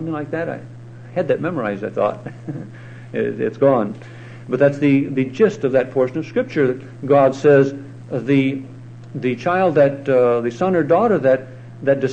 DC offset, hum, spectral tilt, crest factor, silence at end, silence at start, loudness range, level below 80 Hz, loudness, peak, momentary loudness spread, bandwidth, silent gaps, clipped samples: under 0.1%; none; -8 dB/octave; 16 dB; 0 s; 0 s; 5 LU; -60 dBFS; -18 LUFS; -2 dBFS; 18 LU; 8.6 kHz; none; under 0.1%